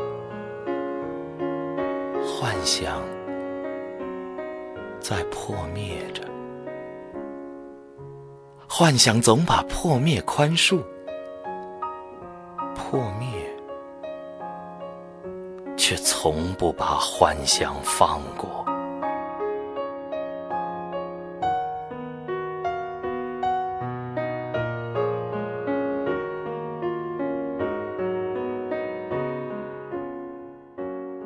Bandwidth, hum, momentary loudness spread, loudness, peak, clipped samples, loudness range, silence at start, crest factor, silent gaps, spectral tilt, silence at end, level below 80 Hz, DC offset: 11 kHz; none; 16 LU; -26 LUFS; 0 dBFS; under 0.1%; 11 LU; 0 s; 26 dB; none; -4 dB/octave; 0 s; -48 dBFS; under 0.1%